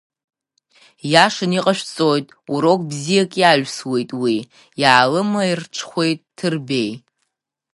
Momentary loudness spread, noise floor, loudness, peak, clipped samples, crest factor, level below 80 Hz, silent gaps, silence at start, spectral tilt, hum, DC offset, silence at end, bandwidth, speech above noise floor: 11 LU; -76 dBFS; -18 LUFS; 0 dBFS; under 0.1%; 18 dB; -66 dBFS; none; 1.05 s; -4.5 dB/octave; none; under 0.1%; 0.75 s; 11.5 kHz; 58 dB